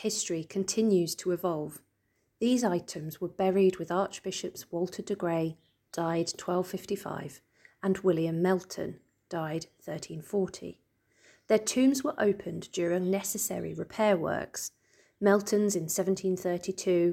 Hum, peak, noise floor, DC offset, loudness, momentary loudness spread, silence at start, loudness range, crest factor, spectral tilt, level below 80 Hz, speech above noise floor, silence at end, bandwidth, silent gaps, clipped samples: none; -12 dBFS; -75 dBFS; under 0.1%; -30 LUFS; 13 LU; 0 s; 4 LU; 18 dB; -5 dB/octave; -68 dBFS; 46 dB; 0 s; 17 kHz; none; under 0.1%